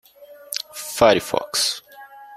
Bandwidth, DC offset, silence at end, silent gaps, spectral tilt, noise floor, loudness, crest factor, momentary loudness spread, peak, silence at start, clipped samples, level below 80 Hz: 16 kHz; under 0.1%; 0 s; none; -2.5 dB/octave; -43 dBFS; -20 LUFS; 22 dB; 13 LU; -2 dBFS; 0.2 s; under 0.1%; -52 dBFS